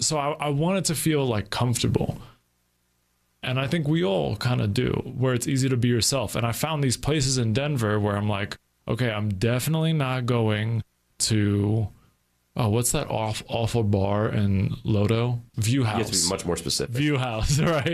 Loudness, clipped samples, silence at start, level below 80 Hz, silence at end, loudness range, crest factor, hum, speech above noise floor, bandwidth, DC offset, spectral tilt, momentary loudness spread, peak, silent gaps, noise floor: -24 LUFS; under 0.1%; 0 s; -46 dBFS; 0 s; 3 LU; 16 dB; none; 46 dB; 14.5 kHz; under 0.1%; -5 dB/octave; 5 LU; -8 dBFS; none; -70 dBFS